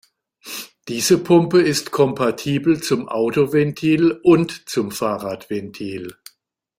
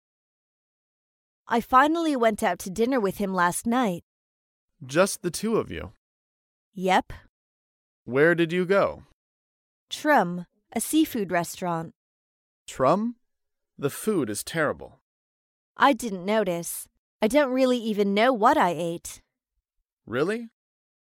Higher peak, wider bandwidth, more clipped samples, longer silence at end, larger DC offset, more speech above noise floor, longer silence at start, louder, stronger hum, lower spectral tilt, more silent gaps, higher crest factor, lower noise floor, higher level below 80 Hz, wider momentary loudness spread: first, -2 dBFS vs -6 dBFS; about the same, 16 kHz vs 17 kHz; neither; about the same, 0.65 s vs 0.7 s; neither; second, 40 dB vs 58 dB; second, 0.45 s vs 1.5 s; first, -18 LUFS vs -24 LUFS; neither; about the same, -5.5 dB/octave vs -4.5 dB/octave; second, none vs 4.03-4.68 s, 5.97-6.72 s, 7.29-8.06 s, 9.13-9.88 s, 11.95-12.66 s, 15.01-15.75 s, 16.98-17.20 s, 19.93-19.97 s; about the same, 16 dB vs 20 dB; second, -58 dBFS vs -82 dBFS; about the same, -58 dBFS vs -58 dBFS; about the same, 16 LU vs 15 LU